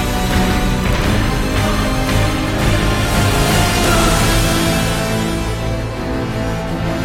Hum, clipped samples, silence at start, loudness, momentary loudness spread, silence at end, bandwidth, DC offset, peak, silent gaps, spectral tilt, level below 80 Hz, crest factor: none; under 0.1%; 0 s; -16 LUFS; 7 LU; 0 s; 16.5 kHz; under 0.1%; -2 dBFS; none; -4.5 dB/octave; -22 dBFS; 14 dB